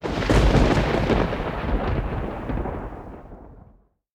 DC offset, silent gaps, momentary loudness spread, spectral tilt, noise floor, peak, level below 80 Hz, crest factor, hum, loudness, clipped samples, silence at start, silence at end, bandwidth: under 0.1%; none; 18 LU; -6.5 dB/octave; -55 dBFS; -4 dBFS; -28 dBFS; 18 dB; none; -23 LUFS; under 0.1%; 0 s; 0.55 s; 11 kHz